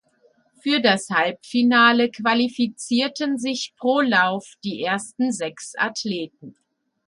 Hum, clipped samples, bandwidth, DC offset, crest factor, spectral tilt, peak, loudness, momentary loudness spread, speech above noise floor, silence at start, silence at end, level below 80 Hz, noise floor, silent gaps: none; under 0.1%; 11.5 kHz; under 0.1%; 18 dB; -3.5 dB/octave; -4 dBFS; -21 LUFS; 12 LU; 40 dB; 0.65 s; 0.55 s; -70 dBFS; -61 dBFS; none